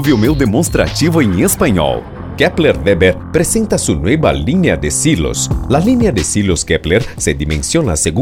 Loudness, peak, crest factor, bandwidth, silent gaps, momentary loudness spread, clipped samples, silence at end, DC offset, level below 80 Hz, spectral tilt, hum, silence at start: -13 LUFS; 0 dBFS; 12 dB; over 20 kHz; none; 4 LU; under 0.1%; 0 s; under 0.1%; -26 dBFS; -5 dB/octave; none; 0 s